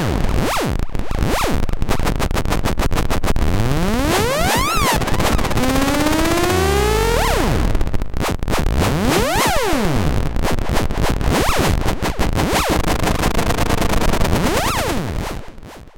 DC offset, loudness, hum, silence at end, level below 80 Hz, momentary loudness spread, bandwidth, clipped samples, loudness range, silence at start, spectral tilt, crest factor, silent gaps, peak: under 0.1%; -18 LUFS; none; 0.05 s; -22 dBFS; 6 LU; 17 kHz; under 0.1%; 3 LU; 0 s; -4.5 dB/octave; 14 dB; none; -2 dBFS